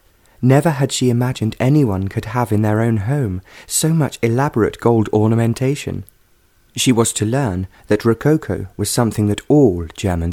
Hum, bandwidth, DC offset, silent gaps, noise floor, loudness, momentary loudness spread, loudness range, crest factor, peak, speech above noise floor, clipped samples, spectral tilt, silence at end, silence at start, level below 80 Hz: none; 16.5 kHz; under 0.1%; none; -55 dBFS; -17 LUFS; 8 LU; 2 LU; 16 dB; -2 dBFS; 39 dB; under 0.1%; -6 dB/octave; 0 s; 0.4 s; -42 dBFS